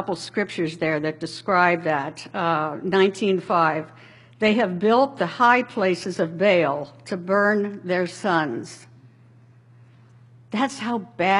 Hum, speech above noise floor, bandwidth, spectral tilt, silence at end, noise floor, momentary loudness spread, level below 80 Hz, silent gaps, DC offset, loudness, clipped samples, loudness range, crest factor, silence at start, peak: none; 29 dB; 11.5 kHz; -5.5 dB/octave; 0 s; -51 dBFS; 11 LU; -68 dBFS; none; under 0.1%; -22 LUFS; under 0.1%; 7 LU; 20 dB; 0 s; -4 dBFS